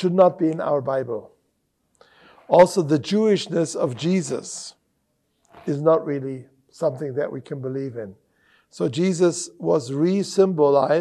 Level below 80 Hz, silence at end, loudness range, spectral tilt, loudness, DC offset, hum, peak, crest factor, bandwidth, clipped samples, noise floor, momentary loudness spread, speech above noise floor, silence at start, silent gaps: -68 dBFS; 0 s; 5 LU; -6 dB/octave; -21 LUFS; under 0.1%; none; -2 dBFS; 18 dB; 12.5 kHz; under 0.1%; -71 dBFS; 15 LU; 50 dB; 0 s; none